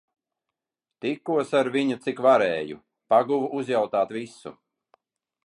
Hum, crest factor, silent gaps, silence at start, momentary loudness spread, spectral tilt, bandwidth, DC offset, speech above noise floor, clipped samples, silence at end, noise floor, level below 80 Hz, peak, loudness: none; 20 dB; none; 1.05 s; 17 LU; -5.5 dB/octave; 11 kHz; under 0.1%; 64 dB; under 0.1%; 0.95 s; -88 dBFS; -74 dBFS; -6 dBFS; -24 LUFS